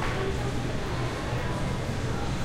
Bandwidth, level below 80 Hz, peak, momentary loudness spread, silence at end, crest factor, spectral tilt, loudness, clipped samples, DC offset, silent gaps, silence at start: 15.5 kHz; -36 dBFS; -16 dBFS; 1 LU; 0 s; 12 dB; -5.5 dB/octave; -31 LUFS; under 0.1%; under 0.1%; none; 0 s